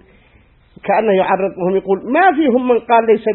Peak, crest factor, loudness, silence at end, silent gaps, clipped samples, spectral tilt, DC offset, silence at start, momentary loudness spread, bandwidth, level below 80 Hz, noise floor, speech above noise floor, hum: 0 dBFS; 14 dB; -14 LUFS; 0 s; none; under 0.1%; -11.5 dB/octave; under 0.1%; 0.85 s; 6 LU; 4.2 kHz; -54 dBFS; -50 dBFS; 36 dB; none